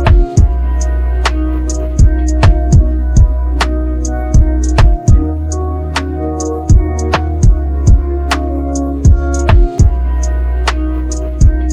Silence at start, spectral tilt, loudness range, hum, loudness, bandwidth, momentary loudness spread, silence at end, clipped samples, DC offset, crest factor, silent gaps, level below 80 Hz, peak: 0 s; -6 dB/octave; 2 LU; none; -13 LUFS; 9.8 kHz; 7 LU; 0 s; under 0.1%; under 0.1%; 10 dB; none; -12 dBFS; 0 dBFS